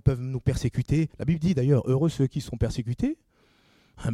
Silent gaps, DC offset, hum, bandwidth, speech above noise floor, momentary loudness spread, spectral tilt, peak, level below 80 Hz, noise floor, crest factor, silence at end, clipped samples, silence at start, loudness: none; under 0.1%; none; 12.5 kHz; 37 dB; 7 LU; -8 dB/octave; -8 dBFS; -42 dBFS; -62 dBFS; 18 dB; 0 s; under 0.1%; 0.05 s; -26 LUFS